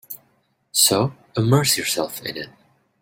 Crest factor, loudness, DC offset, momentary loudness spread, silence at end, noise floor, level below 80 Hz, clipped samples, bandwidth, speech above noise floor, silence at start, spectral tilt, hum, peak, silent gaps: 22 dB; -19 LUFS; under 0.1%; 21 LU; 0.5 s; -65 dBFS; -58 dBFS; under 0.1%; 16.5 kHz; 44 dB; 0.1 s; -3.5 dB/octave; none; -2 dBFS; none